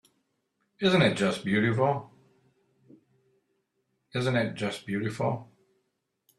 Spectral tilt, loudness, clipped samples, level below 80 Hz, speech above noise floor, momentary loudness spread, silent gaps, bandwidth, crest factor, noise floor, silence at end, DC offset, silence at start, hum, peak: -6 dB/octave; -28 LUFS; under 0.1%; -66 dBFS; 52 dB; 11 LU; none; 12.5 kHz; 22 dB; -78 dBFS; 0.95 s; under 0.1%; 0.8 s; none; -8 dBFS